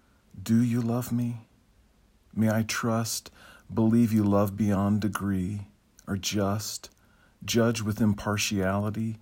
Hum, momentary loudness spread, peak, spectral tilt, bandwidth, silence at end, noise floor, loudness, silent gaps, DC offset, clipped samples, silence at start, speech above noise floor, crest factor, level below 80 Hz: none; 12 LU; -12 dBFS; -5.5 dB/octave; 16.5 kHz; 0.05 s; -62 dBFS; -27 LUFS; none; under 0.1%; under 0.1%; 0.35 s; 36 dB; 16 dB; -58 dBFS